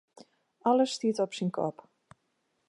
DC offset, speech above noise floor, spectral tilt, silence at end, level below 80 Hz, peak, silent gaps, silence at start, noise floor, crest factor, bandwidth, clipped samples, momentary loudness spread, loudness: under 0.1%; 48 dB; -5.5 dB/octave; 1 s; -80 dBFS; -14 dBFS; none; 0.65 s; -77 dBFS; 18 dB; 11.5 kHz; under 0.1%; 8 LU; -29 LUFS